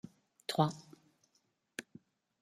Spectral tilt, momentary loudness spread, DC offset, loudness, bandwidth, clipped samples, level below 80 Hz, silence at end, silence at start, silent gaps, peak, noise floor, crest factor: -5.5 dB/octave; 19 LU; under 0.1%; -38 LUFS; 14.5 kHz; under 0.1%; -80 dBFS; 0.6 s; 0.5 s; none; -16 dBFS; -78 dBFS; 26 dB